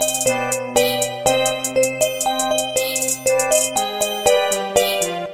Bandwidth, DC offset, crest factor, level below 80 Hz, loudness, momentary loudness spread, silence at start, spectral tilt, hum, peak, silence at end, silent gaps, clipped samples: 16.5 kHz; 0.2%; 18 dB; -52 dBFS; -18 LUFS; 3 LU; 0 s; -1.5 dB/octave; none; -2 dBFS; 0 s; none; under 0.1%